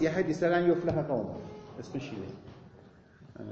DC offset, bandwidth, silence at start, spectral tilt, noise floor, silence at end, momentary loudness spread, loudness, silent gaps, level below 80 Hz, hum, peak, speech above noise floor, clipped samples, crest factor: under 0.1%; 7.6 kHz; 0 s; -7.5 dB/octave; -56 dBFS; 0 s; 21 LU; -31 LUFS; none; -60 dBFS; none; -14 dBFS; 25 dB; under 0.1%; 18 dB